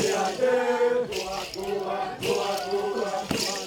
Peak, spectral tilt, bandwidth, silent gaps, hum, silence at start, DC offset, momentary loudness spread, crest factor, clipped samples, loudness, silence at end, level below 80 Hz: -10 dBFS; -3 dB/octave; over 20 kHz; none; none; 0 s; under 0.1%; 7 LU; 16 dB; under 0.1%; -27 LUFS; 0 s; -58 dBFS